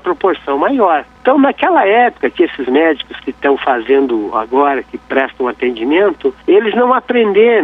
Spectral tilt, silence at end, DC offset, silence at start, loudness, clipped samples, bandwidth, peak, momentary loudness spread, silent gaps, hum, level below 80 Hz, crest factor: -7 dB/octave; 0 s; under 0.1%; 0.05 s; -13 LUFS; under 0.1%; 4.6 kHz; 0 dBFS; 7 LU; none; none; -50 dBFS; 12 dB